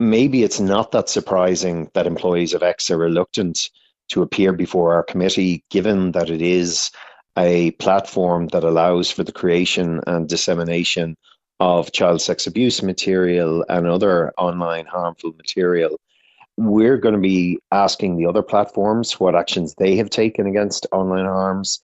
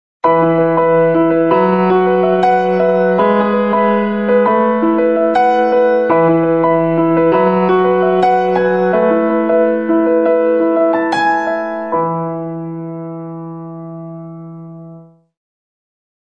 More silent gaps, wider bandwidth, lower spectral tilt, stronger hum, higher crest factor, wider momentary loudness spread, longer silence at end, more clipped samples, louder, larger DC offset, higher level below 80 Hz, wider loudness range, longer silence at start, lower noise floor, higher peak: neither; first, 8.2 kHz vs 7.4 kHz; second, -5 dB/octave vs -8.5 dB/octave; neither; first, 18 dB vs 12 dB; second, 6 LU vs 15 LU; second, 0.1 s vs 1.25 s; neither; second, -18 LUFS vs -13 LUFS; second, under 0.1% vs 0.5%; first, -52 dBFS vs -58 dBFS; second, 2 LU vs 12 LU; second, 0 s vs 0.25 s; first, -54 dBFS vs -38 dBFS; about the same, 0 dBFS vs 0 dBFS